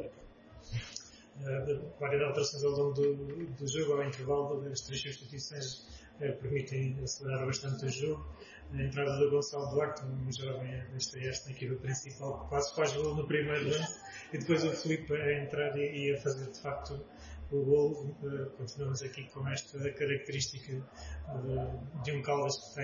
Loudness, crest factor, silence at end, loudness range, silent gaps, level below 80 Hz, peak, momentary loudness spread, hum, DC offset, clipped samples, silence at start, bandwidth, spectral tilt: -35 LUFS; 18 dB; 0 s; 4 LU; none; -56 dBFS; -18 dBFS; 11 LU; none; under 0.1%; under 0.1%; 0 s; 7.2 kHz; -5 dB/octave